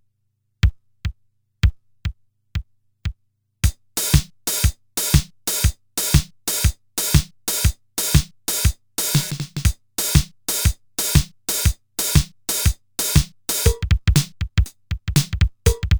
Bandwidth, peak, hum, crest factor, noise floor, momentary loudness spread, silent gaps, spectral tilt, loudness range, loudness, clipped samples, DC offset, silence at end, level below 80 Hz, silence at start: over 20 kHz; 0 dBFS; none; 20 dB; -70 dBFS; 13 LU; none; -3.5 dB/octave; 5 LU; -21 LUFS; under 0.1%; under 0.1%; 0 s; -26 dBFS; 0.65 s